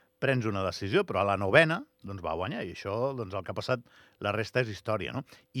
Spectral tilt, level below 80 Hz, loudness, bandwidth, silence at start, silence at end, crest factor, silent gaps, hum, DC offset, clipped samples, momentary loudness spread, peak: -6 dB/octave; -66 dBFS; -30 LUFS; 14.5 kHz; 0.2 s; 0 s; 26 dB; none; none; under 0.1%; under 0.1%; 13 LU; -6 dBFS